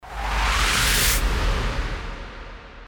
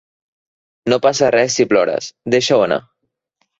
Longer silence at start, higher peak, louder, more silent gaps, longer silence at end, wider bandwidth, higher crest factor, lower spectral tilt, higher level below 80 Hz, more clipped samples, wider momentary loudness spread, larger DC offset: second, 0.05 s vs 0.85 s; second, -6 dBFS vs -2 dBFS; second, -21 LUFS vs -15 LUFS; neither; second, 0 s vs 0.8 s; first, over 20 kHz vs 8 kHz; about the same, 16 dB vs 16 dB; second, -2 dB/octave vs -3.5 dB/octave; first, -26 dBFS vs -58 dBFS; neither; first, 20 LU vs 8 LU; neither